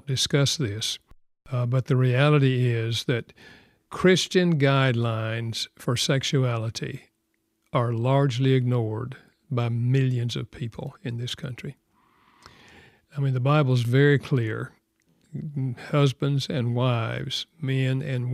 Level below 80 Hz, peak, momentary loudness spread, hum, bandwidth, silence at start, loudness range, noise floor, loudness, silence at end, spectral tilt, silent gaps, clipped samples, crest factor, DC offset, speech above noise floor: -60 dBFS; -6 dBFS; 14 LU; none; 13.5 kHz; 0.05 s; 6 LU; -74 dBFS; -24 LUFS; 0 s; -5.5 dB/octave; none; under 0.1%; 20 dB; under 0.1%; 50 dB